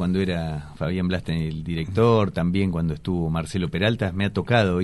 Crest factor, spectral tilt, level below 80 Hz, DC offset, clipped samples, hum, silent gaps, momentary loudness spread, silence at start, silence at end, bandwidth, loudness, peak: 16 dB; -7.5 dB/octave; -42 dBFS; under 0.1%; under 0.1%; none; none; 8 LU; 0 s; 0 s; 11.5 kHz; -24 LUFS; -6 dBFS